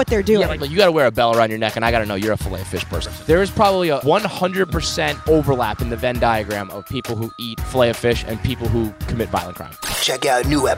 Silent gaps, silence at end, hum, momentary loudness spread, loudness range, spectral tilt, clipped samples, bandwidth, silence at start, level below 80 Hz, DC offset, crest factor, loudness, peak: none; 0 s; none; 10 LU; 3 LU; -5 dB/octave; under 0.1%; 16 kHz; 0 s; -32 dBFS; under 0.1%; 18 dB; -19 LUFS; 0 dBFS